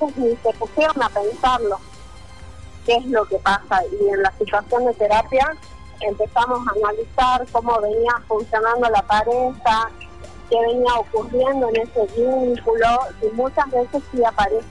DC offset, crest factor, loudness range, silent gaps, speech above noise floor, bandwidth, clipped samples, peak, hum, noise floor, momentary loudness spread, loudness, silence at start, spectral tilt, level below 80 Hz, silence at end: 0.8%; 12 dB; 2 LU; none; 22 dB; 11 kHz; under 0.1%; -6 dBFS; none; -41 dBFS; 5 LU; -19 LUFS; 0 s; -5 dB/octave; -42 dBFS; 0 s